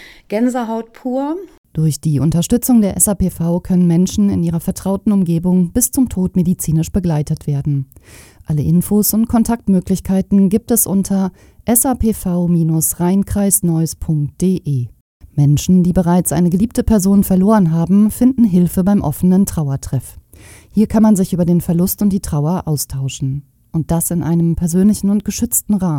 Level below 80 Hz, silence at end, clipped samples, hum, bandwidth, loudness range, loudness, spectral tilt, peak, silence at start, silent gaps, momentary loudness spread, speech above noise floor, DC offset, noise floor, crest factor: -34 dBFS; 0 s; under 0.1%; none; 17 kHz; 4 LU; -15 LUFS; -6.5 dB/octave; 0 dBFS; 0 s; 1.58-1.64 s, 15.01-15.20 s; 9 LU; 27 dB; under 0.1%; -41 dBFS; 14 dB